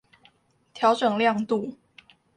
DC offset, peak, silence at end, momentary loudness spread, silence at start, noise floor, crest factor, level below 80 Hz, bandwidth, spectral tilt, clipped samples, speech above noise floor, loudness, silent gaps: under 0.1%; -8 dBFS; 0.65 s; 7 LU; 0.75 s; -61 dBFS; 18 dB; -72 dBFS; 10.5 kHz; -5.5 dB/octave; under 0.1%; 38 dB; -24 LUFS; none